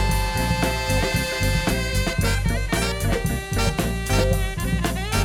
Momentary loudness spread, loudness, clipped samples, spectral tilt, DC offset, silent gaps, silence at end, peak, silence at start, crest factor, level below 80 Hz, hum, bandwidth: 3 LU; -23 LUFS; under 0.1%; -4.5 dB/octave; under 0.1%; none; 0 s; -6 dBFS; 0 s; 16 dB; -26 dBFS; none; 18 kHz